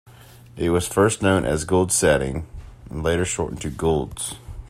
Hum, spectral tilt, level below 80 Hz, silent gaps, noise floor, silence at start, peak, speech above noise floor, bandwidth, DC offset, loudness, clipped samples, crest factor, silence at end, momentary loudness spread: none; -4.5 dB/octave; -40 dBFS; none; -46 dBFS; 0.05 s; -4 dBFS; 25 dB; 15.5 kHz; under 0.1%; -22 LUFS; under 0.1%; 18 dB; 0 s; 13 LU